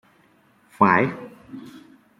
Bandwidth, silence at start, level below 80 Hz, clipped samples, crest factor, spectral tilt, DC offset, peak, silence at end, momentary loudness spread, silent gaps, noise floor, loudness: 11.5 kHz; 0.8 s; -66 dBFS; under 0.1%; 22 dB; -8 dB/octave; under 0.1%; -2 dBFS; 0.4 s; 23 LU; none; -59 dBFS; -19 LUFS